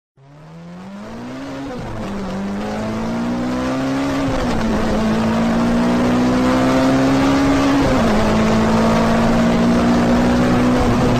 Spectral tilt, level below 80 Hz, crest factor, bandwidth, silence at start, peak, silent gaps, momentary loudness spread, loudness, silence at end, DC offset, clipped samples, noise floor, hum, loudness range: -6.5 dB/octave; -30 dBFS; 10 dB; 14 kHz; 0.35 s; -6 dBFS; none; 13 LU; -16 LUFS; 0 s; under 0.1%; under 0.1%; -39 dBFS; none; 9 LU